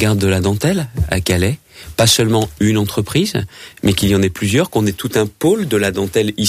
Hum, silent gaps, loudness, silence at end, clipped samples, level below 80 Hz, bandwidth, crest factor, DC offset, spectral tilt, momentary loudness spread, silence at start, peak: none; none; -16 LUFS; 0 s; under 0.1%; -34 dBFS; 16 kHz; 14 dB; under 0.1%; -5 dB/octave; 7 LU; 0 s; -2 dBFS